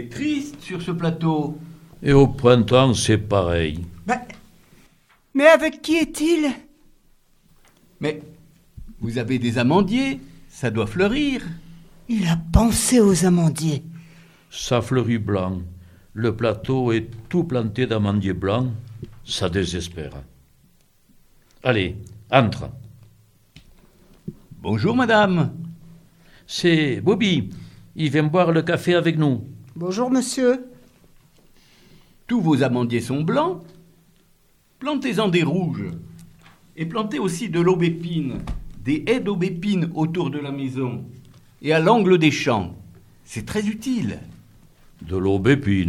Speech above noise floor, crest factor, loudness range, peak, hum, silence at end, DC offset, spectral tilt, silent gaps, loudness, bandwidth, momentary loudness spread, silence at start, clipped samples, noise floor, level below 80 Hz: 39 dB; 22 dB; 6 LU; 0 dBFS; none; 0 s; under 0.1%; -5.5 dB/octave; none; -21 LUFS; 15 kHz; 17 LU; 0 s; under 0.1%; -58 dBFS; -42 dBFS